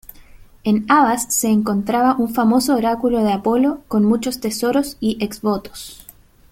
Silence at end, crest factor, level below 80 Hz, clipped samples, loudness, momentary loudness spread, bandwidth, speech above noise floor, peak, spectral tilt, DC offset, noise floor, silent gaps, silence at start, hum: 0.55 s; 16 dB; -48 dBFS; under 0.1%; -18 LUFS; 8 LU; 16.5 kHz; 26 dB; -2 dBFS; -4.5 dB/octave; under 0.1%; -43 dBFS; none; 0.65 s; none